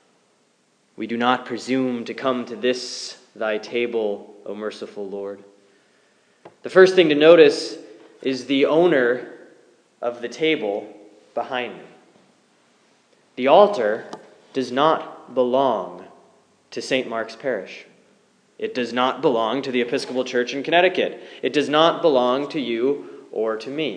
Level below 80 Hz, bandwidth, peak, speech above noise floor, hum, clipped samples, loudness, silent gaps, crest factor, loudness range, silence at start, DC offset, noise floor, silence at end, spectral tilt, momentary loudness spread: -84 dBFS; 10 kHz; 0 dBFS; 43 dB; none; under 0.1%; -21 LUFS; none; 22 dB; 10 LU; 1 s; under 0.1%; -63 dBFS; 0 s; -4.5 dB/octave; 19 LU